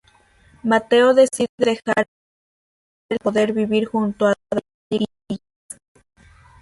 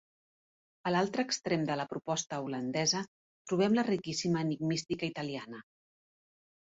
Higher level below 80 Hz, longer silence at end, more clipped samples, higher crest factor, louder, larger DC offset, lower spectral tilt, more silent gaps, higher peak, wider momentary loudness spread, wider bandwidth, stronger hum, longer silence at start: first, -58 dBFS vs -72 dBFS; about the same, 1.25 s vs 1.15 s; neither; about the same, 18 dB vs 18 dB; first, -19 LUFS vs -33 LUFS; neither; about the same, -5 dB/octave vs -4.5 dB/octave; first, 1.49-1.58 s, 2.08-3.09 s, 4.74-4.90 s vs 3.08-3.45 s; first, -2 dBFS vs -16 dBFS; first, 17 LU vs 10 LU; first, 11.5 kHz vs 8 kHz; neither; second, 0.65 s vs 0.85 s